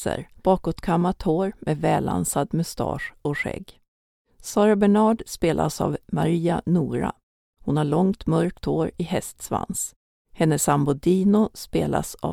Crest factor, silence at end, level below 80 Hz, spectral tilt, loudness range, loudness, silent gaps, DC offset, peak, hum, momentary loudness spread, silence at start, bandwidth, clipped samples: 18 dB; 0 s; -46 dBFS; -6 dB/octave; 3 LU; -23 LUFS; 3.88-4.25 s, 7.23-7.53 s, 9.96-10.25 s; under 0.1%; -4 dBFS; none; 9 LU; 0 s; 17.5 kHz; under 0.1%